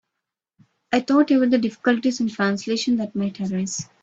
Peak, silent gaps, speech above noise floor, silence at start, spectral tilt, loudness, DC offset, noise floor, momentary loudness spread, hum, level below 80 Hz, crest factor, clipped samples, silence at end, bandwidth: -4 dBFS; none; 62 dB; 0.9 s; -5 dB/octave; -21 LUFS; under 0.1%; -83 dBFS; 8 LU; none; -64 dBFS; 18 dB; under 0.1%; 0.2 s; 8 kHz